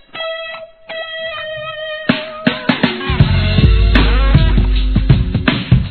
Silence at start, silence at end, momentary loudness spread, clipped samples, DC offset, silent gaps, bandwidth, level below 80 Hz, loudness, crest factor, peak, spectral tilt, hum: 0.15 s; 0 s; 12 LU; 0.2%; 0.3%; none; 4.6 kHz; -16 dBFS; -15 LUFS; 14 dB; 0 dBFS; -9 dB/octave; none